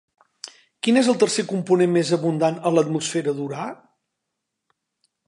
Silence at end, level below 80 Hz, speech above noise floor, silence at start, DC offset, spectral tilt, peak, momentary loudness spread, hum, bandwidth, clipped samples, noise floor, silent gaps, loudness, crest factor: 1.55 s; -76 dBFS; 60 dB; 0.45 s; under 0.1%; -5 dB/octave; -4 dBFS; 18 LU; none; 11.5 kHz; under 0.1%; -80 dBFS; none; -21 LUFS; 18 dB